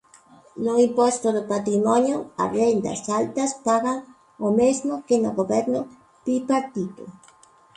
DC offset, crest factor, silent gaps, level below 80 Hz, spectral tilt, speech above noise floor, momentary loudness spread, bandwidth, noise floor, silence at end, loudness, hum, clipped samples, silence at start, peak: under 0.1%; 16 dB; none; -62 dBFS; -5.5 dB/octave; 32 dB; 11 LU; 11 kHz; -54 dBFS; 0.65 s; -23 LUFS; none; under 0.1%; 0.55 s; -8 dBFS